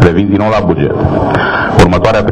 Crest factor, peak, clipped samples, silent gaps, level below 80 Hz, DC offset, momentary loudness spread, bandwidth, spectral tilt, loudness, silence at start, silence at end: 8 dB; 0 dBFS; 0.8%; none; -24 dBFS; under 0.1%; 4 LU; 11.5 kHz; -7 dB/octave; -10 LUFS; 0 s; 0 s